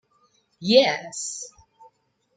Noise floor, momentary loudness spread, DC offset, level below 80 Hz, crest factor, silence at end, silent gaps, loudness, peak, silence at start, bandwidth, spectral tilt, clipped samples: -65 dBFS; 18 LU; under 0.1%; -70 dBFS; 24 dB; 0.9 s; none; -22 LUFS; -2 dBFS; 0.6 s; 9.4 kHz; -3 dB/octave; under 0.1%